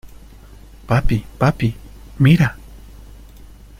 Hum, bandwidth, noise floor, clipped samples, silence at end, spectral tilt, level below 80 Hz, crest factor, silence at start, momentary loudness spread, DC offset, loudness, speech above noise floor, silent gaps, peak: none; 15.5 kHz; -41 dBFS; under 0.1%; 1.05 s; -7.5 dB/octave; -32 dBFS; 18 dB; 0.05 s; 13 LU; under 0.1%; -18 LUFS; 26 dB; none; -2 dBFS